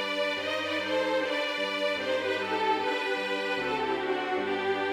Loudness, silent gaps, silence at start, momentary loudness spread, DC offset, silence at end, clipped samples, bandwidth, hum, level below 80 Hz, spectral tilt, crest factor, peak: -29 LUFS; none; 0 s; 2 LU; under 0.1%; 0 s; under 0.1%; 16 kHz; none; -68 dBFS; -3.5 dB/octave; 14 dB; -16 dBFS